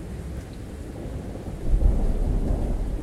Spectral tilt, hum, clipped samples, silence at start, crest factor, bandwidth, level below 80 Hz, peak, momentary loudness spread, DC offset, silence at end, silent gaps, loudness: -8 dB/octave; none; under 0.1%; 0 s; 18 dB; 11.5 kHz; -26 dBFS; -8 dBFS; 12 LU; under 0.1%; 0 s; none; -29 LUFS